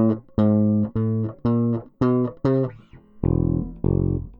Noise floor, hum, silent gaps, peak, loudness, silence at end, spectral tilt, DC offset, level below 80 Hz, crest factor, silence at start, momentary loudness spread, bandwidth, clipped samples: -46 dBFS; none; none; -8 dBFS; -22 LUFS; 0.05 s; -12 dB/octave; under 0.1%; -36 dBFS; 14 dB; 0 s; 5 LU; 5.4 kHz; under 0.1%